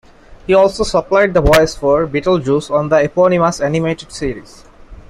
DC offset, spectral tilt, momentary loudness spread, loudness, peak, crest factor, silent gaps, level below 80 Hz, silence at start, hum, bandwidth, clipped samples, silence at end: under 0.1%; -5.5 dB/octave; 11 LU; -14 LUFS; 0 dBFS; 14 dB; none; -32 dBFS; 0.3 s; none; 15.5 kHz; under 0.1%; 0.1 s